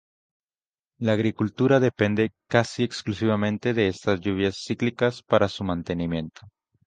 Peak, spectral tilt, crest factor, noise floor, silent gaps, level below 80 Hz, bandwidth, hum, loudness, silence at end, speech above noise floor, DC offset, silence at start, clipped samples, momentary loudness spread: -2 dBFS; -6.5 dB/octave; 22 dB; under -90 dBFS; none; -50 dBFS; 9.4 kHz; none; -24 LUFS; 0.4 s; over 66 dB; under 0.1%; 1 s; under 0.1%; 7 LU